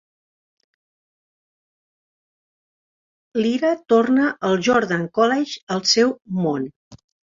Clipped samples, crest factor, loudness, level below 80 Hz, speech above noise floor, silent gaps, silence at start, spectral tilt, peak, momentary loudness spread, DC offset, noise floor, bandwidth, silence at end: under 0.1%; 18 dB; -19 LUFS; -64 dBFS; over 71 dB; 5.63-5.67 s, 6.76-6.91 s; 3.35 s; -4.5 dB/octave; -4 dBFS; 8 LU; under 0.1%; under -90 dBFS; 7.6 kHz; 0.45 s